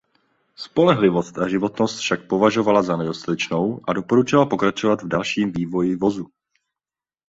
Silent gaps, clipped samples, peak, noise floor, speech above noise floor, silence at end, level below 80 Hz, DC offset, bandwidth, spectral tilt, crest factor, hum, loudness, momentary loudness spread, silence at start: none; under 0.1%; -2 dBFS; under -90 dBFS; over 70 dB; 1 s; -56 dBFS; under 0.1%; 8 kHz; -6 dB/octave; 18 dB; none; -20 LUFS; 8 LU; 0.6 s